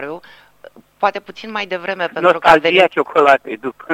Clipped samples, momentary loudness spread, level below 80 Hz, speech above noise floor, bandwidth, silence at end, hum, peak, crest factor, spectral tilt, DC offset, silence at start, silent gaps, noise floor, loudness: under 0.1%; 16 LU; -52 dBFS; 28 dB; 16 kHz; 0 s; 50 Hz at -65 dBFS; 0 dBFS; 16 dB; -4.5 dB/octave; under 0.1%; 0 s; none; -43 dBFS; -14 LUFS